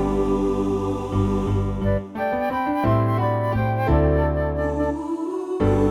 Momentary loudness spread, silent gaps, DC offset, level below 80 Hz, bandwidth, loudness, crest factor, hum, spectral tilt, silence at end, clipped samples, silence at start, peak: 5 LU; none; under 0.1%; -30 dBFS; 13 kHz; -22 LUFS; 14 dB; none; -8.5 dB/octave; 0 s; under 0.1%; 0 s; -8 dBFS